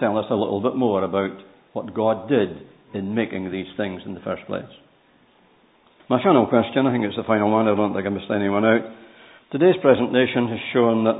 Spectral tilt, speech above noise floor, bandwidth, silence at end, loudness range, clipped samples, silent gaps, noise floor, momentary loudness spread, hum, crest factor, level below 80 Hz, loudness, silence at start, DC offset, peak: -11.5 dB/octave; 37 dB; 4 kHz; 0 s; 9 LU; under 0.1%; none; -57 dBFS; 14 LU; none; 20 dB; -56 dBFS; -21 LUFS; 0 s; under 0.1%; -2 dBFS